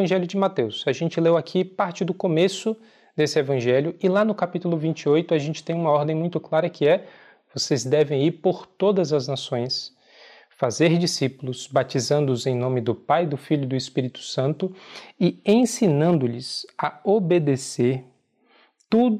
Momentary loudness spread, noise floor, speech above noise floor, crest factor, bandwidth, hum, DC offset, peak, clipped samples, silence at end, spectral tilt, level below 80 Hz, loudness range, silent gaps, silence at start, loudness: 8 LU; -60 dBFS; 38 dB; 16 dB; 13.5 kHz; none; under 0.1%; -8 dBFS; under 0.1%; 0 s; -6 dB/octave; -72 dBFS; 2 LU; none; 0 s; -23 LUFS